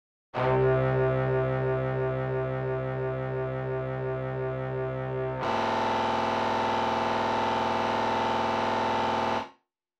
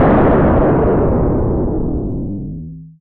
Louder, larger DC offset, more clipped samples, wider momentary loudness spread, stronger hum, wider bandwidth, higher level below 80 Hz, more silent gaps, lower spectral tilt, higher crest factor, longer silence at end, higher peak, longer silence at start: second, -28 LUFS vs -15 LUFS; neither; neither; second, 6 LU vs 15 LU; neither; first, 8.4 kHz vs 4.2 kHz; second, -52 dBFS vs -22 dBFS; neither; second, -6.5 dB/octave vs -13 dB/octave; about the same, 12 dB vs 8 dB; first, 0.5 s vs 0.1 s; second, -16 dBFS vs -4 dBFS; first, 0.35 s vs 0 s